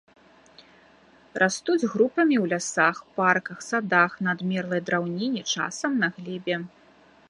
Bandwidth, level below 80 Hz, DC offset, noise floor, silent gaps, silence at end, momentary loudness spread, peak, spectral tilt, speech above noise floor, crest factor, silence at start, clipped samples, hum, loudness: 11.5 kHz; -70 dBFS; under 0.1%; -56 dBFS; none; 0.65 s; 8 LU; -4 dBFS; -4.5 dB/octave; 31 dB; 22 dB; 1.35 s; under 0.1%; none; -25 LUFS